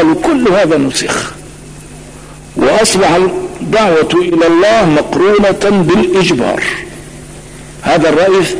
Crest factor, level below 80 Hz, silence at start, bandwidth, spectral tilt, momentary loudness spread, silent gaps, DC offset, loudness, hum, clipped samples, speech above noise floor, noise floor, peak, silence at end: 10 dB; -36 dBFS; 0 s; 11 kHz; -4.5 dB/octave; 22 LU; none; under 0.1%; -10 LUFS; none; under 0.1%; 22 dB; -31 dBFS; 0 dBFS; 0 s